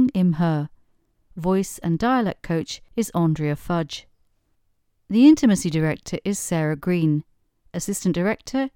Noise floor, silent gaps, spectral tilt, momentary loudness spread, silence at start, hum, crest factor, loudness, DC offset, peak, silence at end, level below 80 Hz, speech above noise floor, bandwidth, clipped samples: -67 dBFS; none; -6 dB/octave; 12 LU; 0 s; none; 18 dB; -22 LUFS; under 0.1%; -4 dBFS; 0.05 s; -50 dBFS; 46 dB; 17.5 kHz; under 0.1%